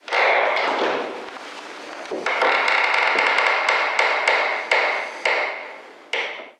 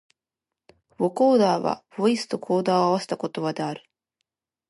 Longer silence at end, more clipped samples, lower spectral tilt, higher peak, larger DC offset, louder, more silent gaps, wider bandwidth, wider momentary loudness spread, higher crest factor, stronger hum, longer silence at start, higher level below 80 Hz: second, 0.1 s vs 0.9 s; neither; second, -0.5 dB/octave vs -6 dB/octave; first, -2 dBFS vs -8 dBFS; neither; first, -19 LUFS vs -23 LUFS; neither; about the same, 12 kHz vs 11.5 kHz; first, 17 LU vs 11 LU; about the same, 18 dB vs 16 dB; neither; second, 0.05 s vs 1 s; about the same, -76 dBFS vs -74 dBFS